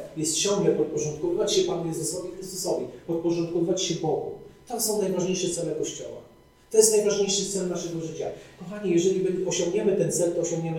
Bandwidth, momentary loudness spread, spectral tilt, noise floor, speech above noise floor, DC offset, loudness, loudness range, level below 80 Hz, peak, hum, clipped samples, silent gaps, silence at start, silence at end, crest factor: 18.5 kHz; 12 LU; -4 dB/octave; -54 dBFS; 28 dB; under 0.1%; -25 LUFS; 3 LU; -60 dBFS; -6 dBFS; none; under 0.1%; none; 0 s; 0 s; 20 dB